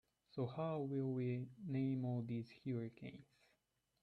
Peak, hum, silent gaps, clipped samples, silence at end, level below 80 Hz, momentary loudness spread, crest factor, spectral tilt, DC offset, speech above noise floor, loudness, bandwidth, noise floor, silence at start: -30 dBFS; none; none; under 0.1%; 0.8 s; -80 dBFS; 12 LU; 14 dB; -10 dB/octave; under 0.1%; 42 dB; -44 LUFS; 5.8 kHz; -85 dBFS; 0.35 s